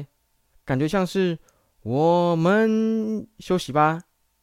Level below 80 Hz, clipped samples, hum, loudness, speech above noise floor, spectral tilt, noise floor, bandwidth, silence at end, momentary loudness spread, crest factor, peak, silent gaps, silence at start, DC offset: -54 dBFS; under 0.1%; none; -22 LUFS; 44 dB; -7 dB/octave; -66 dBFS; 15.5 kHz; 0.4 s; 11 LU; 16 dB; -6 dBFS; none; 0 s; under 0.1%